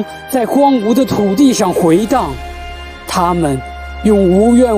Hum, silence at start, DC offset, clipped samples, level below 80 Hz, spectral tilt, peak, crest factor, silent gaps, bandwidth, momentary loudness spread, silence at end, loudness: none; 0 s; under 0.1%; under 0.1%; -32 dBFS; -6 dB/octave; 0 dBFS; 12 dB; none; 16 kHz; 17 LU; 0 s; -12 LUFS